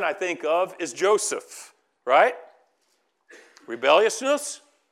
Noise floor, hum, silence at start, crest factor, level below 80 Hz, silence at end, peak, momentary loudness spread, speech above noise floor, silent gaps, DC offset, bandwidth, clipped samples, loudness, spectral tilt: -70 dBFS; none; 0 s; 20 dB; under -90 dBFS; 0.35 s; -4 dBFS; 20 LU; 47 dB; none; under 0.1%; 15.5 kHz; under 0.1%; -23 LUFS; -1.5 dB/octave